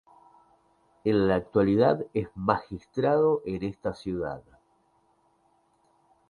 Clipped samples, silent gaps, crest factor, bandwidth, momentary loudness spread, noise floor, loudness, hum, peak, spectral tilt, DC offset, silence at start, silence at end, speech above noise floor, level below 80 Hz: under 0.1%; none; 22 dB; 10 kHz; 11 LU; -67 dBFS; -27 LUFS; none; -6 dBFS; -8.5 dB/octave; under 0.1%; 1.05 s; 1.9 s; 41 dB; -54 dBFS